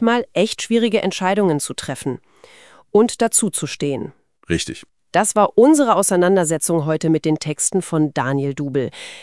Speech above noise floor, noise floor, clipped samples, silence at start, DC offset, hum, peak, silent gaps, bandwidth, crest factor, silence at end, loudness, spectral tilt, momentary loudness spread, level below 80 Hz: 29 dB; -47 dBFS; under 0.1%; 0 s; 0.2%; none; -2 dBFS; none; 12 kHz; 18 dB; 0 s; -18 LUFS; -4.5 dB/octave; 11 LU; -56 dBFS